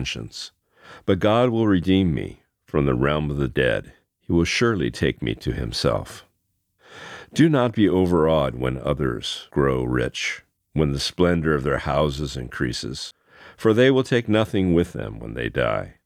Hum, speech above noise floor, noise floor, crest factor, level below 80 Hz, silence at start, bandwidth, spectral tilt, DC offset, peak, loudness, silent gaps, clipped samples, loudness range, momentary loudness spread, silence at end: none; 50 dB; -72 dBFS; 18 dB; -40 dBFS; 0 s; 14.5 kHz; -6 dB/octave; under 0.1%; -4 dBFS; -22 LUFS; none; under 0.1%; 3 LU; 13 LU; 0.15 s